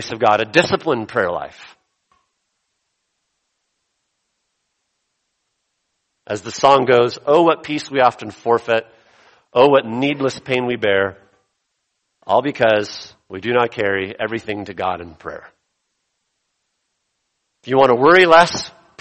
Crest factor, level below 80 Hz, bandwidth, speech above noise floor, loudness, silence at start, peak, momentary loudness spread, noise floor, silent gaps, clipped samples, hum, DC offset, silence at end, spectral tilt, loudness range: 20 dB; -58 dBFS; 8.8 kHz; 56 dB; -16 LUFS; 0 s; 0 dBFS; 16 LU; -73 dBFS; none; under 0.1%; none; under 0.1%; 0.3 s; -4.5 dB/octave; 12 LU